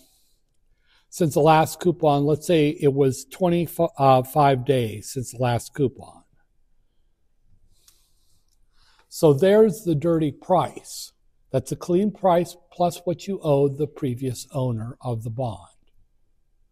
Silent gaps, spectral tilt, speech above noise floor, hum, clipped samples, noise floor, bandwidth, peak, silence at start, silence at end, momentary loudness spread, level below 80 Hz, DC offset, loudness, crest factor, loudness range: none; -6.5 dB/octave; 42 dB; none; under 0.1%; -63 dBFS; 16 kHz; -4 dBFS; 1.15 s; 1.15 s; 13 LU; -54 dBFS; under 0.1%; -22 LUFS; 20 dB; 8 LU